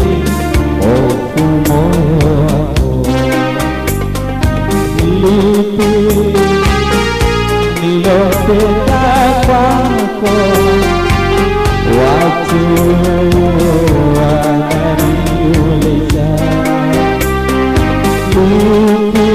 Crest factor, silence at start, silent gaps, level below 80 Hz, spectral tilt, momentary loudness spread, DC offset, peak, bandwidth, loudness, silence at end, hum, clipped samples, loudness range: 8 dB; 0 s; none; -20 dBFS; -6.5 dB/octave; 4 LU; 1%; -2 dBFS; 15.5 kHz; -11 LUFS; 0 s; none; under 0.1%; 2 LU